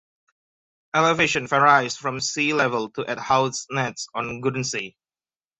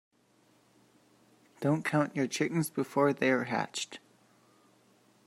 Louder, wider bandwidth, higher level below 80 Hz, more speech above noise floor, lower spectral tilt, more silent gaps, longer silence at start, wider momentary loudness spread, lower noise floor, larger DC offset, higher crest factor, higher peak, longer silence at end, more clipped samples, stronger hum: first, -22 LUFS vs -31 LUFS; second, 8.4 kHz vs 16 kHz; first, -62 dBFS vs -78 dBFS; first, over 68 dB vs 37 dB; second, -3.5 dB/octave vs -5 dB/octave; neither; second, 0.95 s vs 1.6 s; first, 12 LU vs 9 LU; first, under -90 dBFS vs -67 dBFS; neither; about the same, 20 dB vs 20 dB; first, -4 dBFS vs -14 dBFS; second, 0.7 s vs 1.3 s; neither; neither